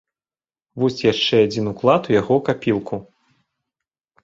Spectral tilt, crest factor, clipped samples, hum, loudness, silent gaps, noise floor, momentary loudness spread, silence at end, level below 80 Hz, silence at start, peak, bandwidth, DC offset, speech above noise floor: -6 dB/octave; 20 dB; under 0.1%; none; -19 LUFS; none; under -90 dBFS; 11 LU; 1.2 s; -54 dBFS; 0.75 s; -2 dBFS; 7.8 kHz; under 0.1%; over 72 dB